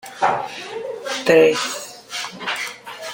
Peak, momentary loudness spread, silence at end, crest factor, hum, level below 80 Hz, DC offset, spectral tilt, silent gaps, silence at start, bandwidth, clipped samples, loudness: -2 dBFS; 16 LU; 0 s; 18 dB; none; -66 dBFS; under 0.1%; -3 dB/octave; none; 0.05 s; 17 kHz; under 0.1%; -21 LUFS